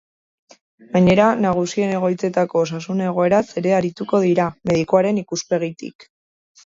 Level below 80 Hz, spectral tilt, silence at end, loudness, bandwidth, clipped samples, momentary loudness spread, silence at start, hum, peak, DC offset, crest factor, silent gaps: -54 dBFS; -6.5 dB/octave; 0.65 s; -19 LUFS; 7.8 kHz; under 0.1%; 8 LU; 0.95 s; none; -2 dBFS; under 0.1%; 16 dB; 5.95-5.99 s